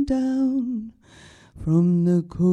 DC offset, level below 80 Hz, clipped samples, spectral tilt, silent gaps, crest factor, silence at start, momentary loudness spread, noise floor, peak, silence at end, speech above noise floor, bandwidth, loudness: under 0.1%; -46 dBFS; under 0.1%; -9.5 dB/octave; none; 14 dB; 0 s; 13 LU; -49 dBFS; -8 dBFS; 0 s; 29 dB; 8.4 kHz; -22 LUFS